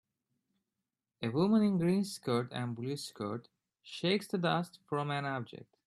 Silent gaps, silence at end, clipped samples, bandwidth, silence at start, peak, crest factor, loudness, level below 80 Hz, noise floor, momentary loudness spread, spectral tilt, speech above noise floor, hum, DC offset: none; 0.3 s; under 0.1%; 13 kHz; 1.2 s; -16 dBFS; 18 dB; -34 LUFS; -76 dBFS; -89 dBFS; 12 LU; -6 dB/octave; 56 dB; none; under 0.1%